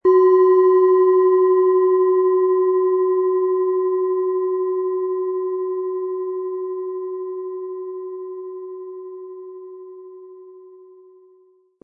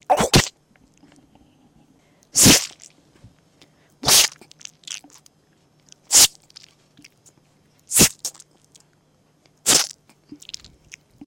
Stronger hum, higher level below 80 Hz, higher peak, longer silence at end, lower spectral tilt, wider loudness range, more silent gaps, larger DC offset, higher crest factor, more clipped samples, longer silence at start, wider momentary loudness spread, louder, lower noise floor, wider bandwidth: neither; second, -76 dBFS vs -44 dBFS; second, -6 dBFS vs -2 dBFS; second, 1.15 s vs 1.4 s; first, -8 dB/octave vs -1.5 dB/octave; first, 19 LU vs 4 LU; neither; neither; second, 14 dB vs 22 dB; neither; about the same, 0.05 s vs 0.1 s; second, 21 LU vs 25 LU; second, -18 LUFS vs -15 LUFS; second, -55 dBFS vs -61 dBFS; second, 2 kHz vs 17 kHz